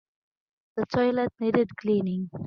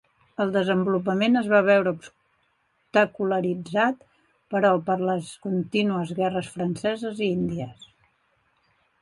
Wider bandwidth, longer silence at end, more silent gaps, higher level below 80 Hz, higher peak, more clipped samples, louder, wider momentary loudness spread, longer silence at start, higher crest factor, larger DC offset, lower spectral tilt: second, 6.6 kHz vs 11.5 kHz; second, 0 s vs 1.3 s; neither; about the same, -64 dBFS vs -64 dBFS; about the same, -8 dBFS vs -6 dBFS; neither; about the same, -26 LUFS vs -24 LUFS; second, 7 LU vs 10 LU; first, 0.75 s vs 0.4 s; about the same, 18 dB vs 18 dB; neither; first, -8.5 dB/octave vs -6.5 dB/octave